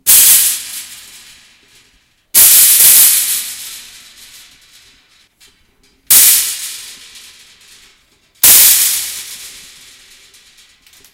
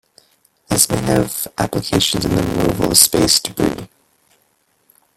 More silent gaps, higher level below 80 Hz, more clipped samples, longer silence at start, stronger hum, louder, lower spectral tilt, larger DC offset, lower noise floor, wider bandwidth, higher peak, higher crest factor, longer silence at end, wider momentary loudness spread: neither; second, -52 dBFS vs -40 dBFS; first, 1% vs under 0.1%; second, 0.05 s vs 0.7 s; neither; first, -6 LUFS vs -15 LUFS; second, 3 dB/octave vs -3.5 dB/octave; neither; second, -54 dBFS vs -62 dBFS; first, over 20 kHz vs 17 kHz; about the same, 0 dBFS vs 0 dBFS; about the same, 14 dB vs 18 dB; first, 1.65 s vs 1.3 s; first, 24 LU vs 10 LU